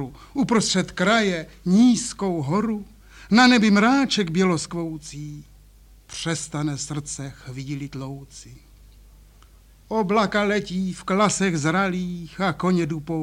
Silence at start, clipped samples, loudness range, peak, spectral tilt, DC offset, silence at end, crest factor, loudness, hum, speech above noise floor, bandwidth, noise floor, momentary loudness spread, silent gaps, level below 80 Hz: 0 s; under 0.1%; 12 LU; -2 dBFS; -4.5 dB/octave; under 0.1%; 0 s; 20 dB; -22 LUFS; none; 29 dB; 12.5 kHz; -50 dBFS; 18 LU; none; -50 dBFS